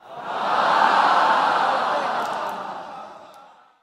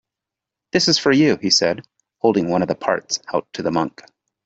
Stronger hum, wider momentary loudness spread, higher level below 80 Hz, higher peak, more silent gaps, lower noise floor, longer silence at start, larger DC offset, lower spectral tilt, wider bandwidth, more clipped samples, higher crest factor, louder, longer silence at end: neither; first, 18 LU vs 9 LU; second, -76 dBFS vs -60 dBFS; about the same, -4 dBFS vs -2 dBFS; neither; second, -49 dBFS vs -86 dBFS; second, 0.05 s vs 0.75 s; neither; about the same, -3 dB/octave vs -3.5 dB/octave; first, 14 kHz vs 8 kHz; neither; about the same, 18 dB vs 18 dB; about the same, -20 LUFS vs -19 LUFS; second, 0.4 s vs 0.55 s